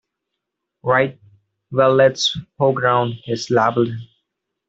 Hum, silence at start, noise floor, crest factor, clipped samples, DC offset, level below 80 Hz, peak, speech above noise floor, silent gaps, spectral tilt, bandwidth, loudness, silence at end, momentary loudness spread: none; 0.85 s; -79 dBFS; 16 dB; under 0.1%; under 0.1%; -58 dBFS; -2 dBFS; 62 dB; none; -5 dB/octave; 7.8 kHz; -18 LUFS; 0.65 s; 11 LU